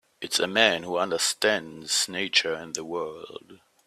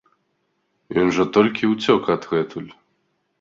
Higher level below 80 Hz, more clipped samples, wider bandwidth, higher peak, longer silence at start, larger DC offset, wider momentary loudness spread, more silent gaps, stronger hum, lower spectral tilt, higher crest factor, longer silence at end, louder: second, -70 dBFS vs -58 dBFS; neither; first, 16 kHz vs 7.6 kHz; about the same, -4 dBFS vs -2 dBFS; second, 0.2 s vs 0.9 s; neither; about the same, 14 LU vs 12 LU; neither; neither; second, -1 dB/octave vs -6 dB/octave; about the same, 24 dB vs 20 dB; second, 0.3 s vs 0.7 s; second, -25 LUFS vs -20 LUFS